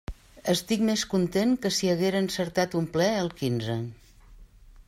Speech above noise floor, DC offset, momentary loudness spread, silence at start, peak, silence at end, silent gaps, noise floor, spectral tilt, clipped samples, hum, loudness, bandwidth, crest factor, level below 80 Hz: 25 dB; under 0.1%; 8 LU; 0.1 s; -10 dBFS; 0.4 s; none; -51 dBFS; -5 dB/octave; under 0.1%; none; -26 LUFS; 16 kHz; 16 dB; -50 dBFS